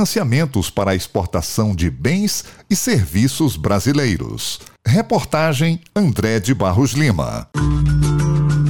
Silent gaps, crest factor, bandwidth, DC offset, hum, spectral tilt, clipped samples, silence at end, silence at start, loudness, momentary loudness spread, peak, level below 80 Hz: none; 12 dB; 18 kHz; 0.9%; none; -5.5 dB/octave; under 0.1%; 0 s; 0 s; -18 LUFS; 5 LU; -4 dBFS; -32 dBFS